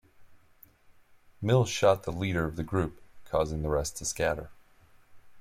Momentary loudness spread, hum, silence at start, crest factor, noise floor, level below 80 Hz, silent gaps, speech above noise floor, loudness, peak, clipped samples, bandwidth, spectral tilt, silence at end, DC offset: 10 LU; none; 0.2 s; 22 dB; -59 dBFS; -48 dBFS; none; 31 dB; -29 LUFS; -10 dBFS; under 0.1%; 16 kHz; -5 dB/octave; 0 s; under 0.1%